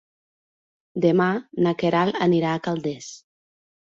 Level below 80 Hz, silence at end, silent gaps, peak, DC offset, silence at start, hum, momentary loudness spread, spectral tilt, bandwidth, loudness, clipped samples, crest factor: -64 dBFS; 0.7 s; none; -6 dBFS; under 0.1%; 0.95 s; none; 14 LU; -6.5 dB/octave; 7.6 kHz; -22 LUFS; under 0.1%; 18 dB